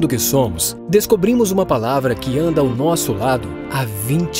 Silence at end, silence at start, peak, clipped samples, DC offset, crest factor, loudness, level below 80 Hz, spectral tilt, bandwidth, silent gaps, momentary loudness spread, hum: 0 s; 0 s; -2 dBFS; under 0.1%; under 0.1%; 16 dB; -17 LUFS; -40 dBFS; -5 dB/octave; 16 kHz; none; 6 LU; none